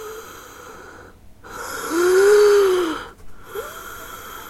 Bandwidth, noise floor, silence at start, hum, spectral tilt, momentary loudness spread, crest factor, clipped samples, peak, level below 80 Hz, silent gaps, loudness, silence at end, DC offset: 16 kHz; -43 dBFS; 0 s; none; -3 dB/octave; 26 LU; 16 dB; under 0.1%; -4 dBFS; -50 dBFS; none; -16 LUFS; 0 s; under 0.1%